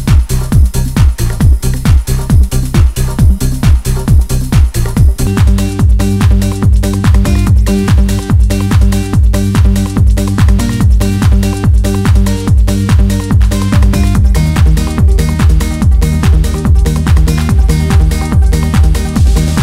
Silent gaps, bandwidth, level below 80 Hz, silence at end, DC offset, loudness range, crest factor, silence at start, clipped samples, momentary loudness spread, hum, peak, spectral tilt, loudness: none; 16 kHz; -10 dBFS; 0 s; under 0.1%; 1 LU; 8 dB; 0 s; 2%; 1 LU; none; 0 dBFS; -6.5 dB/octave; -10 LUFS